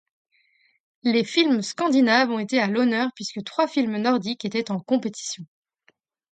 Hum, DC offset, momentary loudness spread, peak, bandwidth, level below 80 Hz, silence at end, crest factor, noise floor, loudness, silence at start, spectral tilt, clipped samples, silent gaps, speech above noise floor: none; under 0.1%; 10 LU; -4 dBFS; 9.2 kHz; -74 dBFS; 0.85 s; 20 dB; -65 dBFS; -23 LUFS; 1.05 s; -4 dB/octave; under 0.1%; none; 43 dB